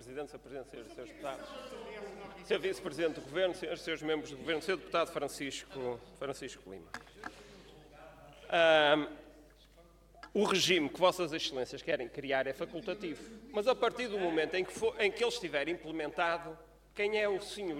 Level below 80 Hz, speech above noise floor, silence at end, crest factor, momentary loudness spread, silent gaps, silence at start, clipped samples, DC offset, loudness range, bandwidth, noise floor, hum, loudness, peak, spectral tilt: -64 dBFS; 26 dB; 0 s; 22 dB; 19 LU; none; 0 s; under 0.1%; under 0.1%; 8 LU; 16.5 kHz; -61 dBFS; none; -34 LUFS; -12 dBFS; -3.5 dB/octave